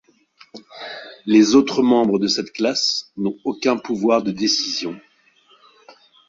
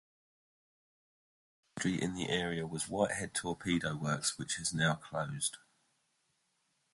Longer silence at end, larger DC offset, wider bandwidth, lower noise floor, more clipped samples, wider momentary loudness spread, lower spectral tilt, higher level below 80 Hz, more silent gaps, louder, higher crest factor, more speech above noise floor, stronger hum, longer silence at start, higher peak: about the same, 1.3 s vs 1.35 s; neither; second, 7.8 kHz vs 11.5 kHz; second, -56 dBFS vs -79 dBFS; neither; first, 18 LU vs 5 LU; about the same, -4 dB/octave vs -3.5 dB/octave; about the same, -62 dBFS vs -64 dBFS; neither; first, -18 LUFS vs -35 LUFS; about the same, 18 dB vs 22 dB; second, 38 dB vs 43 dB; neither; second, 0.55 s vs 1.75 s; first, -2 dBFS vs -16 dBFS